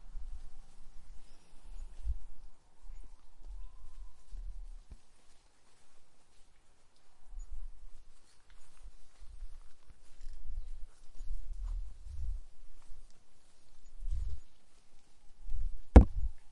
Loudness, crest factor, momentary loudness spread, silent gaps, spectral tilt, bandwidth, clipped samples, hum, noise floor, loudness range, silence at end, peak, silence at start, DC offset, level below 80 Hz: -33 LUFS; 28 dB; 20 LU; none; -8.5 dB/octave; 10 kHz; under 0.1%; none; -56 dBFS; 11 LU; 0 s; -6 dBFS; 0 s; under 0.1%; -38 dBFS